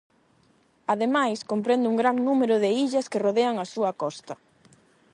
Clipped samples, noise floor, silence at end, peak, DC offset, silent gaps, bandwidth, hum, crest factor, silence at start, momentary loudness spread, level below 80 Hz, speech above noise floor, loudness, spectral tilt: under 0.1%; -63 dBFS; 0.8 s; -10 dBFS; under 0.1%; none; 11 kHz; none; 16 dB; 0.9 s; 11 LU; -78 dBFS; 39 dB; -24 LUFS; -5 dB/octave